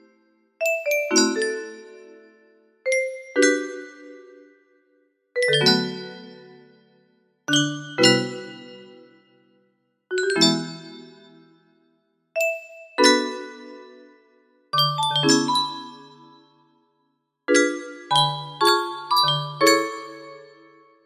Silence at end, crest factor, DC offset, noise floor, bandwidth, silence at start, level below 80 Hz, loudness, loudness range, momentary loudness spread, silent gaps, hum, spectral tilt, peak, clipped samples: 0.65 s; 24 dB; under 0.1%; -72 dBFS; 15 kHz; 0.6 s; -72 dBFS; -21 LUFS; 5 LU; 21 LU; none; none; -3 dB/octave; -2 dBFS; under 0.1%